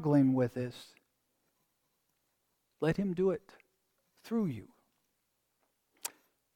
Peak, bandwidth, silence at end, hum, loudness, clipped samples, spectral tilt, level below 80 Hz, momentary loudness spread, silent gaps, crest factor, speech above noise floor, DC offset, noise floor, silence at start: -16 dBFS; 18.5 kHz; 0.45 s; none; -34 LUFS; under 0.1%; -7 dB/octave; -66 dBFS; 15 LU; none; 20 dB; 49 dB; under 0.1%; -80 dBFS; 0 s